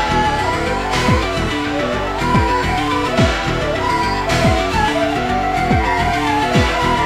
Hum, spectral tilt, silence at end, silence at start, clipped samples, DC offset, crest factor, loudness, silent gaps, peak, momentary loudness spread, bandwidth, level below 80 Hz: none; -5 dB/octave; 0 s; 0 s; under 0.1%; under 0.1%; 14 dB; -16 LUFS; none; -2 dBFS; 4 LU; 16 kHz; -28 dBFS